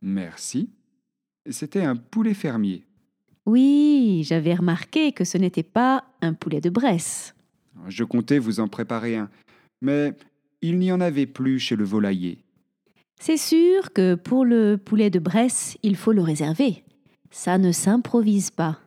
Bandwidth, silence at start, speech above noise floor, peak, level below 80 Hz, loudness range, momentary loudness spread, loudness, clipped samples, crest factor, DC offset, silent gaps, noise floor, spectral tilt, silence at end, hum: 15.5 kHz; 0 s; 55 dB; -6 dBFS; -74 dBFS; 6 LU; 12 LU; -22 LUFS; under 0.1%; 16 dB; under 0.1%; none; -76 dBFS; -5.5 dB/octave; 0.1 s; none